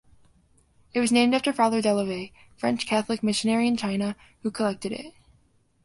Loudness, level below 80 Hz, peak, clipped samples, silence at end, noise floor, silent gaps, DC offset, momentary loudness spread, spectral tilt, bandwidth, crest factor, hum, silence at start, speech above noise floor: -25 LUFS; -62 dBFS; -6 dBFS; under 0.1%; 0.75 s; -63 dBFS; none; under 0.1%; 13 LU; -4.5 dB/octave; 11.5 kHz; 20 dB; none; 0.95 s; 39 dB